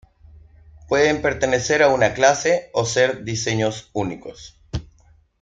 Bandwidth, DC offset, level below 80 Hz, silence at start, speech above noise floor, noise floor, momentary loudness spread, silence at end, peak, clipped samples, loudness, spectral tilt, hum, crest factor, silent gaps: 9.4 kHz; under 0.1%; -46 dBFS; 0.35 s; 35 dB; -55 dBFS; 16 LU; 0.6 s; -2 dBFS; under 0.1%; -19 LUFS; -4 dB/octave; none; 20 dB; none